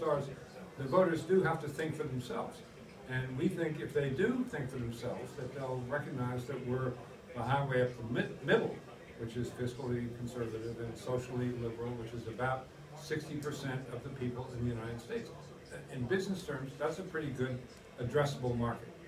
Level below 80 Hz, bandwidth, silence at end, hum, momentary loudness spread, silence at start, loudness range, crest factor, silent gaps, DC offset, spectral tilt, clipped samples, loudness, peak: -60 dBFS; 15.5 kHz; 0 s; none; 13 LU; 0 s; 4 LU; 22 dB; none; under 0.1%; -6.5 dB/octave; under 0.1%; -37 LUFS; -16 dBFS